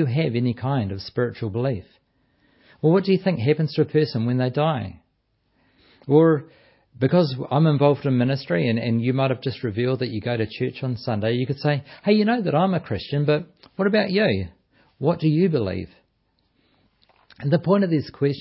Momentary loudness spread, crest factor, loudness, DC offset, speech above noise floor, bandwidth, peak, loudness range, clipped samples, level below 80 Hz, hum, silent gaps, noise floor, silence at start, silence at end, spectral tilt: 8 LU; 18 dB; -22 LUFS; under 0.1%; 48 dB; 5.8 kHz; -4 dBFS; 3 LU; under 0.1%; -52 dBFS; none; none; -69 dBFS; 0 s; 0 s; -12 dB/octave